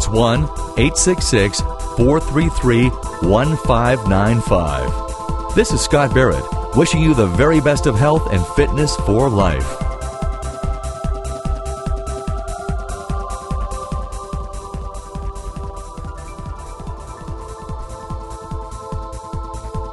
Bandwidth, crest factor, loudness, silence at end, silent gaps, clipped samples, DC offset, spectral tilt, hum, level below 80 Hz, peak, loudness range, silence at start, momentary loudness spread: 12 kHz; 18 dB; -18 LUFS; 0 s; none; under 0.1%; under 0.1%; -5.5 dB/octave; none; -26 dBFS; 0 dBFS; 15 LU; 0 s; 16 LU